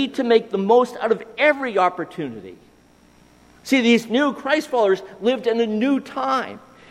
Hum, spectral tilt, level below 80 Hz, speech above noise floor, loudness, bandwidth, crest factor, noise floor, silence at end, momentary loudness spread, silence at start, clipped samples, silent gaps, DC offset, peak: none; -5 dB/octave; -64 dBFS; 33 dB; -20 LUFS; 15 kHz; 18 dB; -53 dBFS; 0.35 s; 12 LU; 0 s; under 0.1%; none; under 0.1%; -4 dBFS